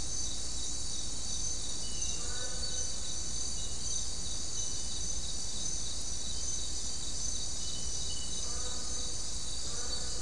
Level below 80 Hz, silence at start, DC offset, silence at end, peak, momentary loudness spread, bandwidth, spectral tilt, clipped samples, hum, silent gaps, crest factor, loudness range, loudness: -46 dBFS; 0 s; 2%; 0 s; -20 dBFS; 2 LU; 12 kHz; -1 dB/octave; under 0.1%; none; none; 16 dB; 0 LU; -35 LUFS